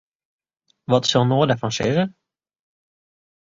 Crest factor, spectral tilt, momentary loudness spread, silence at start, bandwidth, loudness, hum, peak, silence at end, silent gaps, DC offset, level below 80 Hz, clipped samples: 20 dB; -5.5 dB/octave; 8 LU; 0.9 s; 7.8 kHz; -20 LUFS; none; -4 dBFS; 1.5 s; none; under 0.1%; -56 dBFS; under 0.1%